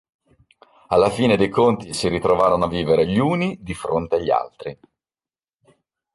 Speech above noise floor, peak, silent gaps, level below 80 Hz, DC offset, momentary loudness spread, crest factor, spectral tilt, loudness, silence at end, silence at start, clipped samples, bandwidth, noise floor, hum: over 71 dB; -4 dBFS; none; -46 dBFS; under 0.1%; 9 LU; 18 dB; -6 dB/octave; -19 LUFS; 1.4 s; 0.9 s; under 0.1%; 11.5 kHz; under -90 dBFS; none